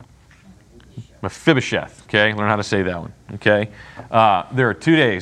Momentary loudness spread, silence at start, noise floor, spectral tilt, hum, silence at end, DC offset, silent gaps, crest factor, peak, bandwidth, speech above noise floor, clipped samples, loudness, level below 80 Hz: 15 LU; 0 s; -48 dBFS; -5.5 dB/octave; none; 0 s; under 0.1%; none; 20 dB; 0 dBFS; 10.5 kHz; 29 dB; under 0.1%; -18 LUFS; -54 dBFS